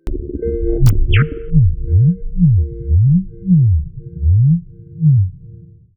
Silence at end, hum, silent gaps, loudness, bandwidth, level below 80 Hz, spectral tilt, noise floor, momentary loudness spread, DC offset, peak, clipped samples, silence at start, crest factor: 0.4 s; none; none; -15 LUFS; 3.7 kHz; -20 dBFS; -10 dB/octave; -39 dBFS; 8 LU; under 0.1%; -2 dBFS; under 0.1%; 0.05 s; 12 dB